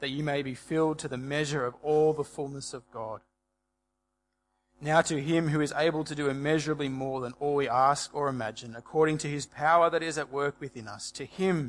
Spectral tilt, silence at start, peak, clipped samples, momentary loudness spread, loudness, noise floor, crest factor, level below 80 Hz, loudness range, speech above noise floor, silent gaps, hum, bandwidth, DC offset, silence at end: -5 dB/octave; 0 s; -8 dBFS; under 0.1%; 14 LU; -29 LUFS; -81 dBFS; 22 dB; -64 dBFS; 5 LU; 52 dB; none; none; 11.5 kHz; under 0.1%; 0 s